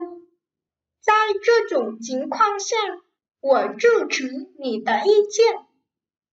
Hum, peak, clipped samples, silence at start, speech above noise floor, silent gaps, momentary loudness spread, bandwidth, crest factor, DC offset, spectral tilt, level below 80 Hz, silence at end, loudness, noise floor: none; -6 dBFS; under 0.1%; 0 s; 68 dB; none; 12 LU; 8 kHz; 16 dB; under 0.1%; -2 dB/octave; -78 dBFS; 0.7 s; -20 LUFS; -88 dBFS